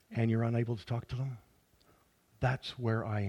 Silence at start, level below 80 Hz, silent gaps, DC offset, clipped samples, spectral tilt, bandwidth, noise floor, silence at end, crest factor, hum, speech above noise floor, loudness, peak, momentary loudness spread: 0.1 s; -60 dBFS; none; under 0.1%; under 0.1%; -8 dB/octave; 8.8 kHz; -68 dBFS; 0 s; 18 dB; none; 35 dB; -35 LUFS; -16 dBFS; 8 LU